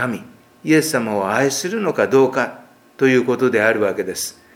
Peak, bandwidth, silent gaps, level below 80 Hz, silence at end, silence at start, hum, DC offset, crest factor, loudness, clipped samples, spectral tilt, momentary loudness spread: 0 dBFS; 17 kHz; none; -66 dBFS; 0.25 s; 0 s; none; under 0.1%; 18 dB; -18 LUFS; under 0.1%; -4.5 dB/octave; 9 LU